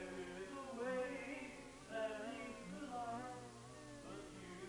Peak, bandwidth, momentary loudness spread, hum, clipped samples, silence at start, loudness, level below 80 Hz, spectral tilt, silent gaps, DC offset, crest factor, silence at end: -32 dBFS; over 20 kHz; 11 LU; none; under 0.1%; 0 s; -49 LUFS; -70 dBFS; -4.5 dB/octave; none; under 0.1%; 16 dB; 0 s